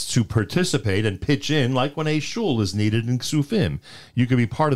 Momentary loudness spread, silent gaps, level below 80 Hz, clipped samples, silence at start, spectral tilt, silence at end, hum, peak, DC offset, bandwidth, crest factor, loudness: 3 LU; none; -46 dBFS; under 0.1%; 0 s; -5.5 dB/octave; 0 s; none; -8 dBFS; 1%; 15 kHz; 14 dB; -22 LUFS